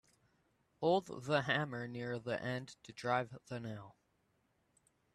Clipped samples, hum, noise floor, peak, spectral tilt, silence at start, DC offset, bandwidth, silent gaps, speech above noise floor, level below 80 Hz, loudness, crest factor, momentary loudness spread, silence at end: under 0.1%; none; -78 dBFS; -20 dBFS; -6 dB/octave; 0.8 s; under 0.1%; 13 kHz; none; 40 dB; -76 dBFS; -38 LUFS; 22 dB; 12 LU; 1.25 s